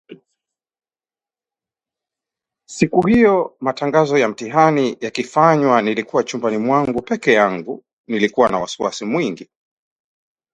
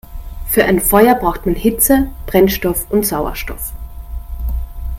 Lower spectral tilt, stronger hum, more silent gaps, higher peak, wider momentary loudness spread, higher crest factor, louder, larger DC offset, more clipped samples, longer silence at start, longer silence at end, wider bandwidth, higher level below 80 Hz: about the same, -5.5 dB/octave vs -4.5 dB/octave; neither; first, 7.93-8.04 s vs none; about the same, 0 dBFS vs 0 dBFS; second, 11 LU vs 19 LU; about the same, 18 dB vs 16 dB; second, -17 LUFS vs -14 LUFS; neither; neither; about the same, 0.1 s vs 0.05 s; first, 1.1 s vs 0 s; second, 9.4 kHz vs 17 kHz; second, -54 dBFS vs -26 dBFS